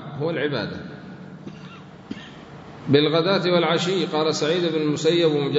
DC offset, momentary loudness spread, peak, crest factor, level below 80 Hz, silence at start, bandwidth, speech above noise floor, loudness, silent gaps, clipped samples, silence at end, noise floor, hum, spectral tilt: under 0.1%; 21 LU; -2 dBFS; 20 dB; -62 dBFS; 0 s; 8 kHz; 20 dB; -21 LUFS; none; under 0.1%; 0 s; -41 dBFS; none; -5.5 dB/octave